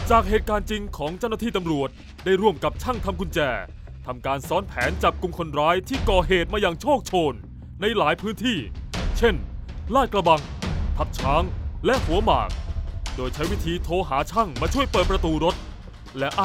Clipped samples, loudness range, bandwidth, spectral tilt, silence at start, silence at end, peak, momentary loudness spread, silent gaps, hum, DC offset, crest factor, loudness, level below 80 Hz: under 0.1%; 3 LU; 16 kHz; -5.5 dB/octave; 0 s; 0 s; -4 dBFS; 11 LU; none; none; under 0.1%; 20 dB; -24 LUFS; -32 dBFS